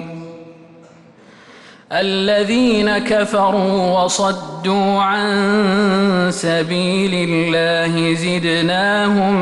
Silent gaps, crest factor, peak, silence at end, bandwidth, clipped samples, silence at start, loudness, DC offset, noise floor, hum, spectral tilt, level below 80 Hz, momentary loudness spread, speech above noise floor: none; 10 dB; -6 dBFS; 0 s; 11.5 kHz; under 0.1%; 0 s; -16 LUFS; under 0.1%; -44 dBFS; none; -5 dB/octave; -50 dBFS; 4 LU; 29 dB